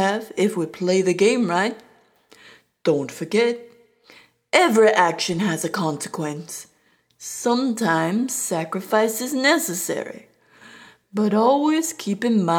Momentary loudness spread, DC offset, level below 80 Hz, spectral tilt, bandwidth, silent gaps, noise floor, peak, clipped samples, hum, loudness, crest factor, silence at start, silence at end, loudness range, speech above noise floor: 12 LU; under 0.1%; -70 dBFS; -4 dB/octave; 19 kHz; none; -62 dBFS; -2 dBFS; under 0.1%; none; -21 LUFS; 20 dB; 0 s; 0 s; 4 LU; 42 dB